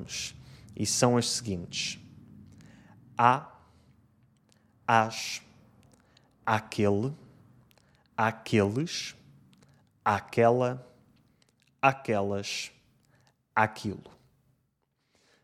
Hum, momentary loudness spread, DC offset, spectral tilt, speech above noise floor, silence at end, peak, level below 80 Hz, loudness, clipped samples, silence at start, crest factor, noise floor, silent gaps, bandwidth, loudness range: none; 15 LU; under 0.1%; -4.5 dB/octave; 48 dB; 1.35 s; -4 dBFS; -68 dBFS; -29 LUFS; under 0.1%; 0 s; 26 dB; -76 dBFS; none; 15.5 kHz; 4 LU